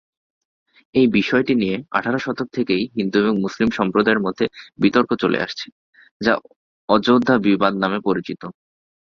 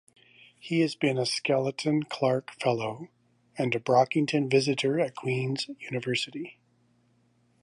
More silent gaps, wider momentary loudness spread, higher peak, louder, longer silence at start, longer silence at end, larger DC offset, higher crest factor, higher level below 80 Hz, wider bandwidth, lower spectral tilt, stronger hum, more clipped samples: first, 5.72-5.93 s, 6.11-6.20 s, 6.56-6.88 s vs none; second, 9 LU vs 12 LU; first, 0 dBFS vs -8 dBFS; first, -19 LUFS vs -28 LUFS; first, 0.95 s vs 0.65 s; second, 0.65 s vs 1.1 s; neither; about the same, 20 dB vs 20 dB; first, -54 dBFS vs -76 dBFS; second, 7.2 kHz vs 11.5 kHz; about the same, -6.5 dB/octave vs -5.5 dB/octave; second, none vs 60 Hz at -60 dBFS; neither